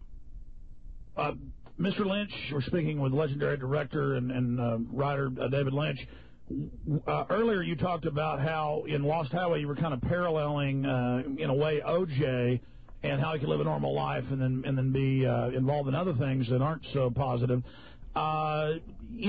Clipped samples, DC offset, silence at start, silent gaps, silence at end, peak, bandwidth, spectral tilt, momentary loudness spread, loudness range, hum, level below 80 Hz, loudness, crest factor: under 0.1%; 0.2%; 0 s; none; 0 s; -16 dBFS; 4.9 kHz; -10.5 dB/octave; 6 LU; 2 LU; none; -50 dBFS; -30 LUFS; 14 dB